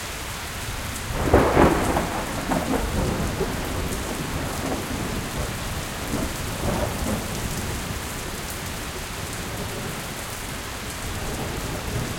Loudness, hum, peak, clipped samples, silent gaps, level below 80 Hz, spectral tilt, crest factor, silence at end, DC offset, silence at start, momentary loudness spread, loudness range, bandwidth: -26 LUFS; none; -2 dBFS; under 0.1%; none; -34 dBFS; -4.5 dB/octave; 24 dB; 0 s; under 0.1%; 0 s; 10 LU; 7 LU; 17 kHz